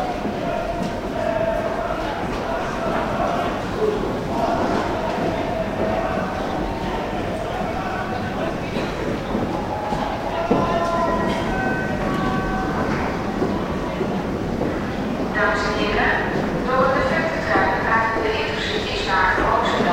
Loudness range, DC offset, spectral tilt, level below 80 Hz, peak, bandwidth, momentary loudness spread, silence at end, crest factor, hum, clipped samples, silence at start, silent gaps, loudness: 5 LU; under 0.1%; -6 dB/octave; -36 dBFS; -4 dBFS; 16.5 kHz; 6 LU; 0 s; 18 dB; none; under 0.1%; 0 s; none; -22 LUFS